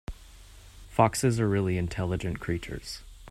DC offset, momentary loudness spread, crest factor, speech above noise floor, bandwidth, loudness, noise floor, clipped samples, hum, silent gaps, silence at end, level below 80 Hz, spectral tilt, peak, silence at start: under 0.1%; 17 LU; 24 dB; 22 dB; 15.5 kHz; -28 LUFS; -50 dBFS; under 0.1%; none; none; 0 s; -46 dBFS; -6 dB/octave; -6 dBFS; 0.1 s